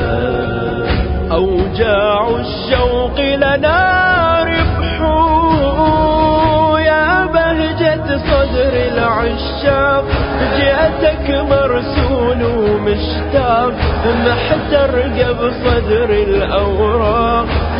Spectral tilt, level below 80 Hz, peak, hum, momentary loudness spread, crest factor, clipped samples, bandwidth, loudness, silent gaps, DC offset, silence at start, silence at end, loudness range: -11.5 dB/octave; -22 dBFS; 0 dBFS; none; 5 LU; 12 dB; under 0.1%; 5.4 kHz; -13 LUFS; none; under 0.1%; 0 s; 0 s; 2 LU